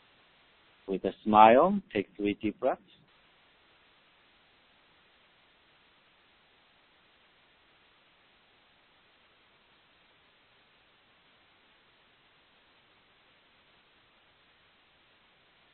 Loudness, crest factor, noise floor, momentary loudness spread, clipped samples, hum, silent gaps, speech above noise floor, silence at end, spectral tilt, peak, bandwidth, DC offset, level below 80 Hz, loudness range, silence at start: -26 LUFS; 28 dB; -65 dBFS; 18 LU; under 0.1%; none; none; 40 dB; 13 s; -4 dB/octave; -4 dBFS; 4.3 kHz; under 0.1%; -68 dBFS; 14 LU; 0.9 s